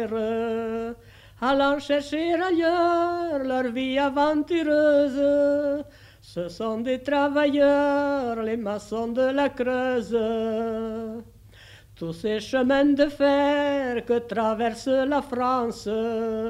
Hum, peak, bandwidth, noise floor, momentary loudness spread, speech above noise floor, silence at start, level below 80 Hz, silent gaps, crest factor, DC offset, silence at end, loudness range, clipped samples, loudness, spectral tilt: none; -8 dBFS; 12.5 kHz; -49 dBFS; 10 LU; 25 dB; 0 s; -54 dBFS; none; 16 dB; under 0.1%; 0 s; 4 LU; under 0.1%; -24 LUFS; -5.5 dB/octave